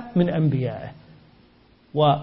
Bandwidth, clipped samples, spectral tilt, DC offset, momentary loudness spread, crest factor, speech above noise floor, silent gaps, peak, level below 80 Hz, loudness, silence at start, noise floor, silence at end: 5.4 kHz; under 0.1%; -12 dB/octave; under 0.1%; 15 LU; 16 dB; 35 dB; none; -8 dBFS; -56 dBFS; -23 LUFS; 0 s; -55 dBFS; 0 s